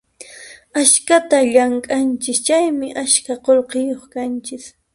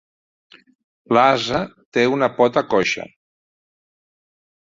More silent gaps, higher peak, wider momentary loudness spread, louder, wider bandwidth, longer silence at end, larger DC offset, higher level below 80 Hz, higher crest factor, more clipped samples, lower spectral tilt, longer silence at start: second, none vs 1.85-1.92 s; about the same, 0 dBFS vs -2 dBFS; first, 14 LU vs 9 LU; about the same, -16 LUFS vs -18 LUFS; first, 11.5 kHz vs 7.8 kHz; second, 0.25 s vs 1.65 s; neither; about the same, -60 dBFS vs -56 dBFS; about the same, 18 dB vs 20 dB; neither; second, -1 dB/octave vs -5 dB/octave; second, 0.2 s vs 1.1 s